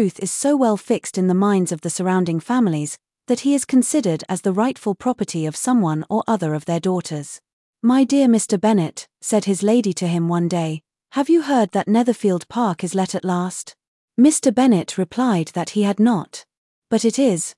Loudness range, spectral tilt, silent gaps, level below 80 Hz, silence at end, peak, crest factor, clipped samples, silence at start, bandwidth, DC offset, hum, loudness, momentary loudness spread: 2 LU; -5.5 dB/octave; 7.53-7.73 s, 13.88-14.08 s, 16.58-16.82 s; -68 dBFS; 0.05 s; -4 dBFS; 14 dB; under 0.1%; 0 s; 12 kHz; under 0.1%; none; -19 LUFS; 10 LU